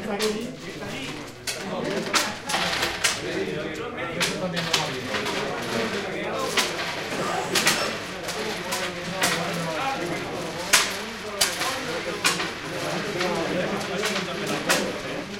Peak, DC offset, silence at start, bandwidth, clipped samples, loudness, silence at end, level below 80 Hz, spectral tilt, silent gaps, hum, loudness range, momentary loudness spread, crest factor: -2 dBFS; under 0.1%; 0 s; 16.5 kHz; under 0.1%; -25 LUFS; 0 s; -54 dBFS; -2.5 dB/octave; none; none; 2 LU; 9 LU; 24 dB